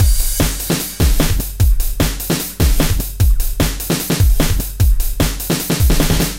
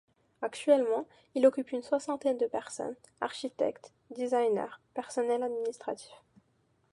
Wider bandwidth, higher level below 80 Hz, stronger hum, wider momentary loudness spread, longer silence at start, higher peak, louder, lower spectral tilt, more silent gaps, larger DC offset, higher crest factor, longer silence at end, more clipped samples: first, 17 kHz vs 11.5 kHz; first, -16 dBFS vs -80 dBFS; neither; second, 4 LU vs 13 LU; second, 0 s vs 0.4 s; first, 0 dBFS vs -12 dBFS; first, -17 LUFS vs -32 LUFS; about the same, -4.5 dB/octave vs -4 dB/octave; neither; first, 0.4% vs under 0.1%; second, 14 dB vs 20 dB; second, 0 s vs 0.75 s; neither